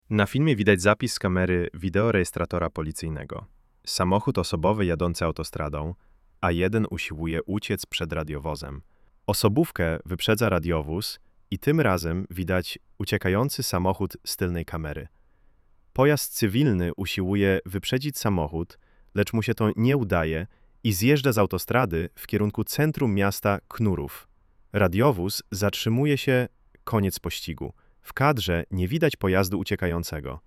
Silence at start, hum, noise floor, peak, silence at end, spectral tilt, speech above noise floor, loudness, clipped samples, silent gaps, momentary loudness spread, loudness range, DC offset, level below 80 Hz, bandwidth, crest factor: 0.1 s; none; -58 dBFS; -4 dBFS; 0.1 s; -5.5 dB/octave; 34 dB; -25 LUFS; under 0.1%; none; 11 LU; 3 LU; under 0.1%; -44 dBFS; 16 kHz; 22 dB